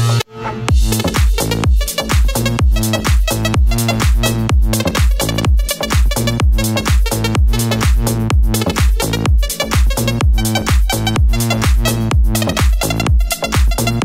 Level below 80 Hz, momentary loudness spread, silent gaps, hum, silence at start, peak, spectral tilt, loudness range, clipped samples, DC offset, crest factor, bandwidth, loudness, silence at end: -16 dBFS; 2 LU; none; none; 0 s; 0 dBFS; -4.5 dB/octave; 0 LU; under 0.1%; under 0.1%; 12 dB; 16.5 kHz; -15 LUFS; 0 s